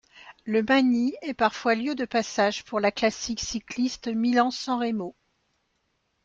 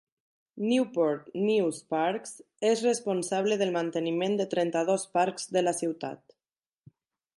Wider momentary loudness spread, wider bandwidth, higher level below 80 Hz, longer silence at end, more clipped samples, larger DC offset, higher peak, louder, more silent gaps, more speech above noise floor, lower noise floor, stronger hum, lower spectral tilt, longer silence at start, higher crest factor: about the same, 9 LU vs 7 LU; second, 7.6 kHz vs 11.5 kHz; first, -60 dBFS vs -80 dBFS; about the same, 1.15 s vs 1.2 s; neither; neither; first, -8 dBFS vs -12 dBFS; first, -25 LUFS vs -28 LUFS; neither; second, 49 dB vs over 62 dB; second, -74 dBFS vs under -90 dBFS; neither; about the same, -4 dB/octave vs -4.5 dB/octave; second, 0.15 s vs 0.55 s; about the same, 18 dB vs 16 dB